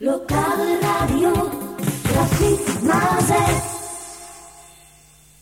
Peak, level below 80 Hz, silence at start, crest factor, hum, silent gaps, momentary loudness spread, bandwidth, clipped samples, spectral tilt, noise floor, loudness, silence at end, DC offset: -6 dBFS; -38 dBFS; 0 s; 14 dB; none; none; 15 LU; 16.5 kHz; under 0.1%; -5 dB/octave; -50 dBFS; -19 LUFS; 0.8 s; under 0.1%